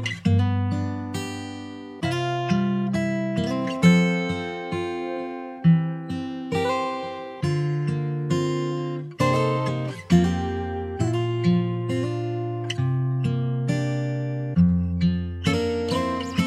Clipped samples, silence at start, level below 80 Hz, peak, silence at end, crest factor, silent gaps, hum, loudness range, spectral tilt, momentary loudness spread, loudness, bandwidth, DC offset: under 0.1%; 0 s; -48 dBFS; -6 dBFS; 0 s; 18 dB; none; none; 3 LU; -7 dB/octave; 10 LU; -24 LUFS; 11.5 kHz; under 0.1%